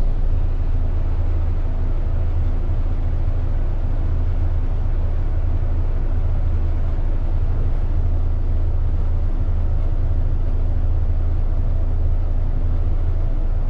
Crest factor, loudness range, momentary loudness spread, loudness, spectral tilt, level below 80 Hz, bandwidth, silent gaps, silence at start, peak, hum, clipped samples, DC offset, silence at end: 8 dB; 1 LU; 2 LU; -24 LUFS; -10 dB/octave; -18 dBFS; 2.9 kHz; none; 0 s; -8 dBFS; none; under 0.1%; under 0.1%; 0 s